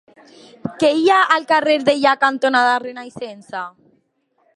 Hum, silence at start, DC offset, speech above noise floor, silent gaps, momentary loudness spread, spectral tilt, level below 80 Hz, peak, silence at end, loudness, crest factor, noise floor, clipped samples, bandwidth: none; 0.65 s; under 0.1%; 48 dB; none; 18 LU; -4 dB/octave; -68 dBFS; 0 dBFS; 0.85 s; -15 LUFS; 18 dB; -64 dBFS; under 0.1%; 11.5 kHz